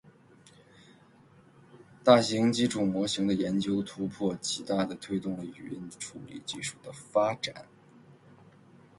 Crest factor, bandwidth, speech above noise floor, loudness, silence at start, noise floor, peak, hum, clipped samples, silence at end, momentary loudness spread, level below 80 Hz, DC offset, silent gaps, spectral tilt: 24 dB; 11.5 kHz; 29 dB; -29 LUFS; 1.75 s; -58 dBFS; -6 dBFS; none; under 0.1%; 0.85 s; 18 LU; -66 dBFS; under 0.1%; none; -5 dB/octave